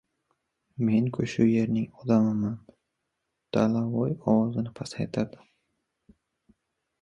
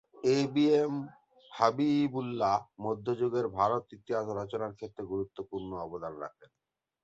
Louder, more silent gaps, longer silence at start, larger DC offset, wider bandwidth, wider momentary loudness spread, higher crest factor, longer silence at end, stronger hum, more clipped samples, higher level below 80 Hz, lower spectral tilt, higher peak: first, -27 LUFS vs -31 LUFS; neither; first, 0.8 s vs 0.15 s; neither; about the same, 8.8 kHz vs 8 kHz; second, 10 LU vs 13 LU; about the same, 20 dB vs 22 dB; first, 1.75 s vs 0.6 s; neither; neither; first, -60 dBFS vs -66 dBFS; first, -8 dB/octave vs -6.5 dB/octave; about the same, -8 dBFS vs -10 dBFS